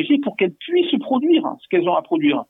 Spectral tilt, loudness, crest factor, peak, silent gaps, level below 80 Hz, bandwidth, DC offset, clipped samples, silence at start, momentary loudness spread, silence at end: -8.5 dB/octave; -19 LUFS; 12 dB; -8 dBFS; none; -76 dBFS; 4 kHz; under 0.1%; under 0.1%; 0 s; 4 LU; 0.05 s